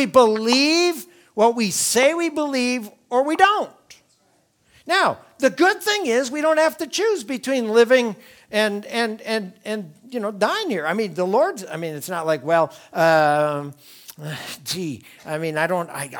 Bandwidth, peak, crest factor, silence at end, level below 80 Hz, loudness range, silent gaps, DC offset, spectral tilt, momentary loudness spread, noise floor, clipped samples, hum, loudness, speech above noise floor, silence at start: 19.5 kHz; 0 dBFS; 20 dB; 0 s; -68 dBFS; 4 LU; none; under 0.1%; -3.5 dB/octave; 14 LU; -62 dBFS; under 0.1%; none; -20 LUFS; 42 dB; 0 s